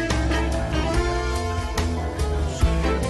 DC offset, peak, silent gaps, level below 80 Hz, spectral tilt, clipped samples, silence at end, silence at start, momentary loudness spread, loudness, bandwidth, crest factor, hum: under 0.1%; -8 dBFS; none; -26 dBFS; -5.5 dB/octave; under 0.1%; 0 s; 0 s; 3 LU; -24 LUFS; 12.5 kHz; 14 dB; none